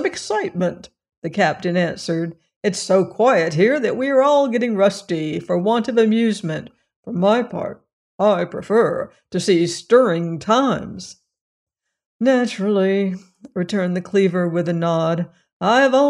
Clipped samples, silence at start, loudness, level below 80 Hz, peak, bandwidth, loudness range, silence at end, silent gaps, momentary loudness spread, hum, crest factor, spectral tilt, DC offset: under 0.1%; 0 s; -19 LUFS; -62 dBFS; -2 dBFS; 11 kHz; 3 LU; 0 s; 1.17-1.22 s, 2.56-2.61 s, 6.96-7.03 s, 7.93-8.18 s, 11.41-11.67 s, 12.06-12.19 s, 15.53-15.60 s; 12 LU; none; 16 dB; -6 dB/octave; under 0.1%